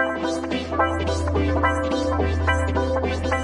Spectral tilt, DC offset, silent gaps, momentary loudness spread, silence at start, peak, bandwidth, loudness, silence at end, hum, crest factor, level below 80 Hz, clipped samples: -6 dB/octave; under 0.1%; none; 4 LU; 0 s; -6 dBFS; 11 kHz; -23 LUFS; 0 s; none; 16 dB; -34 dBFS; under 0.1%